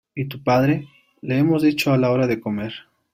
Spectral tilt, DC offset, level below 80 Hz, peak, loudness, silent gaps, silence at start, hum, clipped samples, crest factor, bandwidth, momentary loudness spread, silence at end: -7 dB/octave; under 0.1%; -56 dBFS; -6 dBFS; -20 LUFS; none; 0.15 s; none; under 0.1%; 16 dB; 16 kHz; 13 LU; 0.35 s